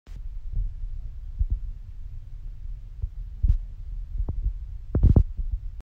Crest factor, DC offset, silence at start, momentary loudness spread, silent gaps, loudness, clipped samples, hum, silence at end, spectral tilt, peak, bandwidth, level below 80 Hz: 20 dB; under 0.1%; 0.05 s; 20 LU; none; -29 LUFS; under 0.1%; none; 0 s; -11 dB/octave; -6 dBFS; 1.8 kHz; -28 dBFS